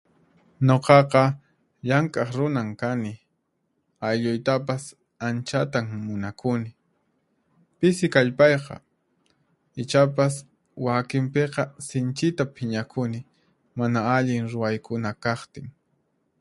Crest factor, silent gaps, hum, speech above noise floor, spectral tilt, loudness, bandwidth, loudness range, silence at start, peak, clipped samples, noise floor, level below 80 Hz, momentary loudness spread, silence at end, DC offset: 24 dB; none; none; 51 dB; -6.5 dB/octave; -24 LUFS; 11.5 kHz; 5 LU; 0.6 s; 0 dBFS; under 0.1%; -74 dBFS; -62 dBFS; 16 LU; 0.7 s; under 0.1%